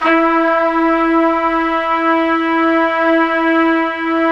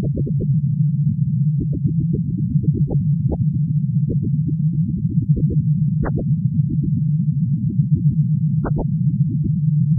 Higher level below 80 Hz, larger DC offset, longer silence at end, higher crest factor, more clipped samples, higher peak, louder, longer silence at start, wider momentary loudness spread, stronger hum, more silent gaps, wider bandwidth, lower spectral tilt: second, -46 dBFS vs -36 dBFS; neither; about the same, 0 s vs 0 s; about the same, 14 dB vs 14 dB; neither; first, 0 dBFS vs -4 dBFS; first, -14 LUFS vs -19 LUFS; about the same, 0 s vs 0 s; about the same, 3 LU vs 2 LU; neither; neither; first, 6 kHz vs 1.9 kHz; second, -5 dB/octave vs -15.5 dB/octave